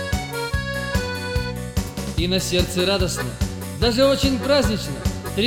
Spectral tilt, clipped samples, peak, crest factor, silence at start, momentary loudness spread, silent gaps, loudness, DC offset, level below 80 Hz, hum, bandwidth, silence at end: -4.5 dB/octave; under 0.1%; -4 dBFS; 18 dB; 0 s; 9 LU; none; -22 LUFS; under 0.1%; -32 dBFS; none; over 20 kHz; 0 s